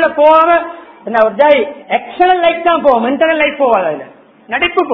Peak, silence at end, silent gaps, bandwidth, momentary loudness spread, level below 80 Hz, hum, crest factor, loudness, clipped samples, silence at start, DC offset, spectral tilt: 0 dBFS; 0 s; none; 6 kHz; 11 LU; -50 dBFS; none; 12 dB; -11 LUFS; 0.3%; 0 s; under 0.1%; -6.5 dB/octave